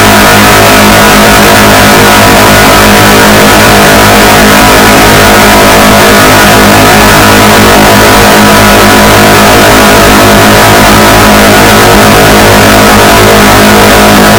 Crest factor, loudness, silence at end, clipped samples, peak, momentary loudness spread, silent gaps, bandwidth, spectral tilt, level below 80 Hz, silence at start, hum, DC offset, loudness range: 0 dB; 0 LUFS; 0 s; 40%; 0 dBFS; 0 LU; none; over 20 kHz; -3.5 dB/octave; -16 dBFS; 0 s; none; under 0.1%; 0 LU